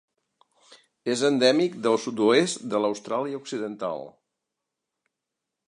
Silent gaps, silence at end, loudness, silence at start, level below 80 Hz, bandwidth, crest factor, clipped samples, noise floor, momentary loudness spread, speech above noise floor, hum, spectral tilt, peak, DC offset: none; 1.6 s; -25 LUFS; 0.7 s; -78 dBFS; 11 kHz; 20 dB; under 0.1%; -85 dBFS; 12 LU; 61 dB; none; -4 dB/octave; -6 dBFS; under 0.1%